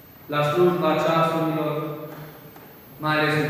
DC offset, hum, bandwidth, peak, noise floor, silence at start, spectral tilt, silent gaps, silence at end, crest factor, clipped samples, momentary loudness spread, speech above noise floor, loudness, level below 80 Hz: under 0.1%; none; 15 kHz; -8 dBFS; -45 dBFS; 0.2 s; -6.5 dB/octave; none; 0 s; 16 dB; under 0.1%; 20 LU; 23 dB; -22 LUFS; -62 dBFS